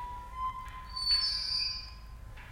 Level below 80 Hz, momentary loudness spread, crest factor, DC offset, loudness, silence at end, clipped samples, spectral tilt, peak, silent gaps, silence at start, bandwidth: -48 dBFS; 22 LU; 16 dB; under 0.1%; -31 LUFS; 0 s; under 0.1%; -1 dB/octave; -18 dBFS; none; 0 s; 16.5 kHz